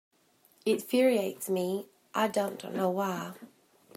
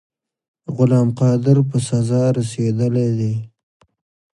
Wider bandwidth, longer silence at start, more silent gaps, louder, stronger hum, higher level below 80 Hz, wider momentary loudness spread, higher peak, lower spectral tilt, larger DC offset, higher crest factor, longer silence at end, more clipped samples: first, 16 kHz vs 11.5 kHz; about the same, 0.65 s vs 0.7 s; neither; second, -30 LUFS vs -18 LUFS; neither; second, -82 dBFS vs -56 dBFS; first, 12 LU vs 8 LU; second, -14 dBFS vs -2 dBFS; second, -5 dB/octave vs -8 dB/octave; neither; about the same, 18 dB vs 16 dB; second, 0.5 s vs 0.85 s; neither